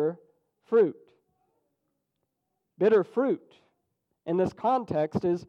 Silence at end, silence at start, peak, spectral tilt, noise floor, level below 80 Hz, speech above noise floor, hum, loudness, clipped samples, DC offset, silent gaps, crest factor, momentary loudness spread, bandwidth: 0.05 s; 0 s; -12 dBFS; -8.5 dB/octave; -81 dBFS; -66 dBFS; 56 dB; none; -27 LUFS; under 0.1%; under 0.1%; none; 16 dB; 9 LU; 7 kHz